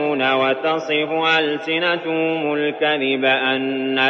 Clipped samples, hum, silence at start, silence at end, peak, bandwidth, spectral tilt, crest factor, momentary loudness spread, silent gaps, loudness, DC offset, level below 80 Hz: under 0.1%; none; 0 s; 0 s; -4 dBFS; 7.2 kHz; -5 dB/octave; 16 dB; 4 LU; none; -19 LUFS; under 0.1%; -72 dBFS